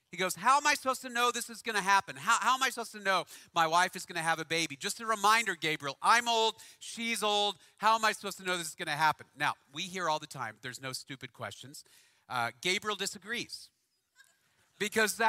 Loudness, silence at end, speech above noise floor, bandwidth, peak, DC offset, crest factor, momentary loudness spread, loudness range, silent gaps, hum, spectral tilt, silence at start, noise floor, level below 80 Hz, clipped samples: -31 LUFS; 0 s; 38 dB; 16 kHz; -12 dBFS; under 0.1%; 22 dB; 14 LU; 8 LU; none; none; -1.5 dB/octave; 0.1 s; -70 dBFS; -78 dBFS; under 0.1%